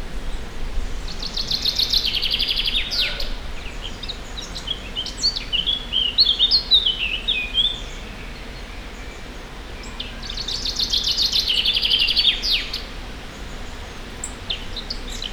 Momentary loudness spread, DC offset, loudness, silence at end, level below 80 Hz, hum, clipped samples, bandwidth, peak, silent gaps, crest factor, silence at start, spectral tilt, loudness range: 20 LU; under 0.1%; -19 LUFS; 0 s; -32 dBFS; none; under 0.1%; over 20 kHz; -4 dBFS; none; 20 dB; 0 s; -1.5 dB/octave; 7 LU